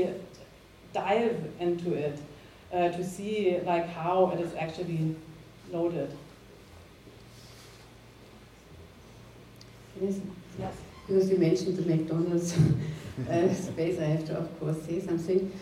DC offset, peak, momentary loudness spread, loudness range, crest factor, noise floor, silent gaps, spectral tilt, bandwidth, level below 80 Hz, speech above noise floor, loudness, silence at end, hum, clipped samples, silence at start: under 0.1%; -12 dBFS; 24 LU; 15 LU; 18 dB; -53 dBFS; none; -7 dB/octave; 15 kHz; -58 dBFS; 24 dB; -30 LUFS; 0 s; none; under 0.1%; 0 s